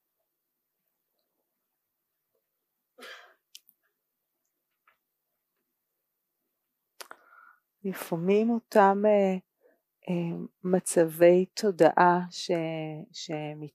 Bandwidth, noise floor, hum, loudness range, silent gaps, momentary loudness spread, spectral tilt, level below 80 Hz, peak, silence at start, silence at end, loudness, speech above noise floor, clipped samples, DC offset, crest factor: 15.5 kHz; -83 dBFS; none; 9 LU; none; 18 LU; -5.5 dB/octave; -84 dBFS; -6 dBFS; 3 s; 0.05 s; -26 LUFS; 58 dB; under 0.1%; under 0.1%; 22 dB